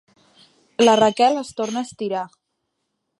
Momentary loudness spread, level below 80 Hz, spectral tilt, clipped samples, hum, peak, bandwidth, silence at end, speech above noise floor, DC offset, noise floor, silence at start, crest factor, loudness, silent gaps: 15 LU; -64 dBFS; -4 dB/octave; under 0.1%; none; -2 dBFS; 11.5 kHz; 0.9 s; 57 dB; under 0.1%; -76 dBFS; 0.8 s; 18 dB; -19 LUFS; none